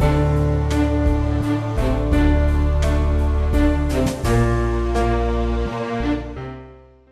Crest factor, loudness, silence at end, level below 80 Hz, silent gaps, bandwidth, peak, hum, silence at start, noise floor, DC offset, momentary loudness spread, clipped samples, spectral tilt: 14 dB; -20 LUFS; 0.4 s; -22 dBFS; none; 13 kHz; -4 dBFS; none; 0 s; -43 dBFS; under 0.1%; 6 LU; under 0.1%; -7.5 dB/octave